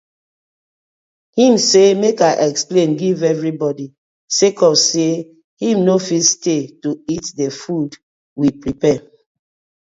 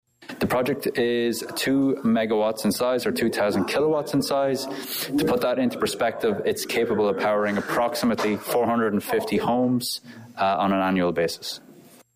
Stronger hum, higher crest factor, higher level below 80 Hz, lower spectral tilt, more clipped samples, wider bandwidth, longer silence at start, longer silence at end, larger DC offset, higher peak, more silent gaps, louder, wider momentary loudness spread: neither; first, 16 dB vs 10 dB; about the same, -56 dBFS vs -58 dBFS; about the same, -4 dB/octave vs -5 dB/octave; neither; second, 8 kHz vs 16 kHz; first, 1.35 s vs 0.2 s; first, 0.8 s vs 0.4 s; neither; first, 0 dBFS vs -14 dBFS; first, 3.98-4.28 s, 5.44-5.57 s, 8.03-8.36 s vs none; first, -15 LUFS vs -24 LUFS; first, 12 LU vs 5 LU